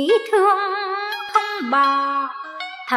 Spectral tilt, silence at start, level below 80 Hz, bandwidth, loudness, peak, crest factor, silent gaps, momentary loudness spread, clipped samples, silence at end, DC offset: -2 dB/octave; 0 s; -82 dBFS; 14.5 kHz; -19 LUFS; -4 dBFS; 16 dB; none; 13 LU; under 0.1%; 0 s; under 0.1%